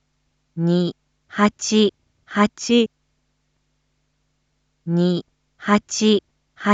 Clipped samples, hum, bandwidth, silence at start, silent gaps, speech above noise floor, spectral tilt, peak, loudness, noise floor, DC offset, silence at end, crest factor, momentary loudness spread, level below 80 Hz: under 0.1%; none; 8 kHz; 0.55 s; none; 51 dB; -5 dB/octave; -4 dBFS; -20 LUFS; -69 dBFS; under 0.1%; 0 s; 18 dB; 10 LU; -60 dBFS